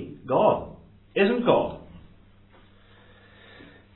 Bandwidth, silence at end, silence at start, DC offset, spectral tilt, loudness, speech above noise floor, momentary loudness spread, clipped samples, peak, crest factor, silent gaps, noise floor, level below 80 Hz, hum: 4.2 kHz; 1.95 s; 0 s; under 0.1%; -10 dB/octave; -24 LUFS; 32 dB; 16 LU; under 0.1%; -6 dBFS; 22 dB; none; -54 dBFS; -56 dBFS; none